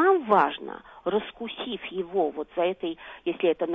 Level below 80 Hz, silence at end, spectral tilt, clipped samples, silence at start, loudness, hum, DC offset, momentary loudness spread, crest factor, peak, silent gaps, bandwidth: -64 dBFS; 0 s; -7.5 dB/octave; under 0.1%; 0 s; -27 LUFS; none; under 0.1%; 13 LU; 18 dB; -8 dBFS; none; 4.3 kHz